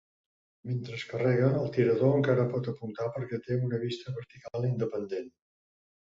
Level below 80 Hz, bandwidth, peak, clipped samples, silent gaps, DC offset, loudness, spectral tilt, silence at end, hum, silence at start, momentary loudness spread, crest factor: -66 dBFS; 7.6 kHz; -12 dBFS; under 0.1%; none; under 0.1%; -30 LUFS; -8.5 dB/octave; 0.8 s; none; 0.65 s; 14 LU; 20 dB